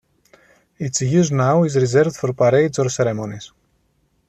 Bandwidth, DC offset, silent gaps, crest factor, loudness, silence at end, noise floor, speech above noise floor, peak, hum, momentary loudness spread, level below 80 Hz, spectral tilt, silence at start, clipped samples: 9 kHz; under 0.1%; none; 14 dB; -18 LUFS; 0.8 s; -64 dBFS; 47 dB; -4 dBFS; none; 12 LU; -56 dBFS; -6 dB/octave; 0.8 s; under 0.1%